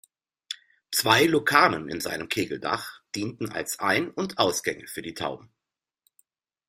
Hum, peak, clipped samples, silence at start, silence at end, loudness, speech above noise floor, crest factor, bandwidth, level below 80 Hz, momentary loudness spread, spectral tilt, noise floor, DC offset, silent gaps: none; -2 dBFS; under 0.1%; 0.5 s; 1.25 s; -25 LUFS; 63 dB; 26 dB; 16 kHz; -64 dBFS; 16 LU; -3 dB/octave; -89 dBFS; under 0.1%; none